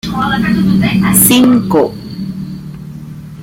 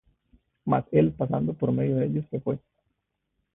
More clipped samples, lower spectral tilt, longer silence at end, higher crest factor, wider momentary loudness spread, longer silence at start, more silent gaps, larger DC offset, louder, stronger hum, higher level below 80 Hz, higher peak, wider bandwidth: first, 0.2% vs under 0.1%; second, -4.5 dB/octave vs -13 dB/octave; second, 0 s vs 1 s; second, 12 dB vs 20 dB; first, 22 LU vs 9 LU; second, 0.05 s vs 0.65 s; neither; neither; first, -10 LUFS vs -26 LUFS; neither; first, -36 dBFS vs -56 dBFS; first, 0 dBFS vs -8 dBFS; first, 17 kHz vs 3.8 kHz